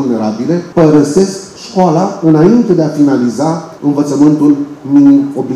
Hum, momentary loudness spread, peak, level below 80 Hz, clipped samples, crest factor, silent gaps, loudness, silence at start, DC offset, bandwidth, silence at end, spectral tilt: none; 8 LU; 0 dBFS; -48 dBFS; 0.6%; 10 dB; none; -10 LUFS; 0 s; under 0.1%; 11.5 kHz; 0 s; -7.5 dB/octave